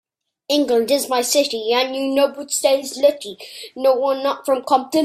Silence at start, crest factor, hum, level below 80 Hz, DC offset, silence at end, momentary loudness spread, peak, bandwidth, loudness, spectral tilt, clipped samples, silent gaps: 0.5 s; 16 dB; none; -66 dBFS; under 0.1%; 0 s; 4 LU; -2 dBFS; 16 kHz; -18 LUFS; -1.5 dB/octave; under 0.1%; none